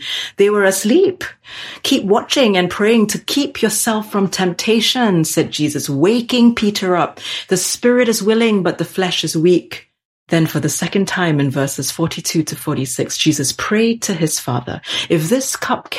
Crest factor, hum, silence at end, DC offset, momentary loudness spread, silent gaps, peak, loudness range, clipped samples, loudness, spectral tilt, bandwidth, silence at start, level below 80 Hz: 14 dB; none; 0 s; under 0.1%; 7 LU; 10.05-10.27 s; -2 dBFS; 3 LU; under 0.1%; -16 LUFS; -4 dB/octave; 16 kHz; 0 s; -54 dBFS